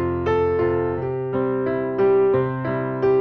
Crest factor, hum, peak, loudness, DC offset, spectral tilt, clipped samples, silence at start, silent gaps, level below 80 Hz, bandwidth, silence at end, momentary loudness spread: 12 dB; none; -8 dBFS; -21 LUFS; under 0.1%; -10 dB/octave; under 0.1%; 0 s; none; -46 dBFS; 5.4 kHz; 0 s; 7 LU